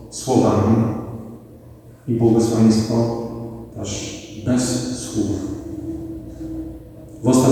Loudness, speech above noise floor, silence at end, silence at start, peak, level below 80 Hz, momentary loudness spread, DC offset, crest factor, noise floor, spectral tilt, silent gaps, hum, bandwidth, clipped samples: -20 LUFS; 25 dB; 0 s; 0 s; -2 dBFS; -44 dBFS; 18 LU; under 0.1%; 18 dB; -42 dBFS; -6.5 dB/octave; none; none; 14.5 kHz; under 0.1%